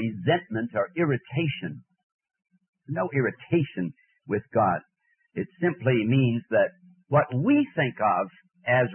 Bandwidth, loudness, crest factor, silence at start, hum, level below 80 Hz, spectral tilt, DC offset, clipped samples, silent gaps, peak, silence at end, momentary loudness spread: 3.3 kHz; -26 LUFS; 16 dB; 0 s; none; -68 dBFS; -11.5 dB/octave; under 0.1%; under 0.1%; 2.03-2.19 s, 2.69-2.73 s; -10 dBFS; 0 s; 12 LU